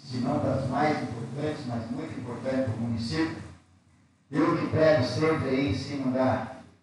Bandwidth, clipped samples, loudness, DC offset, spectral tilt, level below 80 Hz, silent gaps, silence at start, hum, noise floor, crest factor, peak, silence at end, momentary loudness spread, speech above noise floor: 11.5 kHz; under 0.1%; -28 LUFS; under 0.1%; -7 dB/octave; -58 dBFS; none; 0 s; none; -62 dBFS; 18 dB; -10 dBFS; 0.2 s; 11 LU; 35 dB